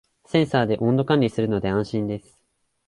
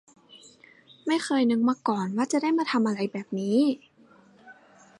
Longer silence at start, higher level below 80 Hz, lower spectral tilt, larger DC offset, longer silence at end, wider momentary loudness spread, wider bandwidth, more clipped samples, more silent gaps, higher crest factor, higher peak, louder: about the same, 0.35 s vs 0.35 s; first, -52 dBFS vs -80 dBFS; first, -7.5 dB/octave vs -5 dB/octave; neither; first, 0.7 s vs 0.45 s; about the same, 7 LU vs 7 LU; about the same, 11.5 kHz vs 11.5 kHz; neither; neither; about the same, 18 dB vs 16 dB; first, -6 dBFS vs -12 dBFS; first, -22 LUFS vs -26 LUFS